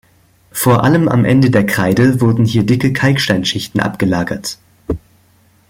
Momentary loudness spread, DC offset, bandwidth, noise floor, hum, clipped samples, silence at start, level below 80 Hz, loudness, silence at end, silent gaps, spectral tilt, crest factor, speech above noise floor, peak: 14 LU; under 0.1%; 16.5 kHz; -51 dBFS; none; under 0.1%; 0.55 s; -42 dBFS; -13 LUFS; 0.7 s; none; -6 dB/octave; 14 dB; 39 dB; 0 dBFS